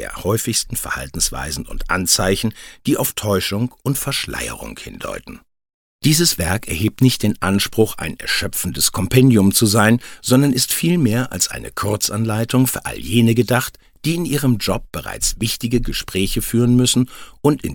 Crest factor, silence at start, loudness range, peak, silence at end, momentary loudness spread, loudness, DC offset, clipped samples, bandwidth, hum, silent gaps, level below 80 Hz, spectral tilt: 18 dB; 0 s; 5 LU; 0 dBFS; 0 s; 11 LU; -18 LUFS; under 0.1%; under 0.1%; 17.5 kHz; none; 5.74-5.99 s; -36 dBFS; -4.5 dB/octave